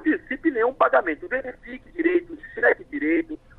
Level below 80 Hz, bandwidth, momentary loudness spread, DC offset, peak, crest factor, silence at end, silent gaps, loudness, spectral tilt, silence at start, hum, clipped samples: -52 dBFS; 4.1 kHz; 16 LU; under 0.1%; -6 dBFS; 18 dB; 0.25 s; none; -23 LUFS; -7.5 dB/octave; 0 s; none; under 0.1%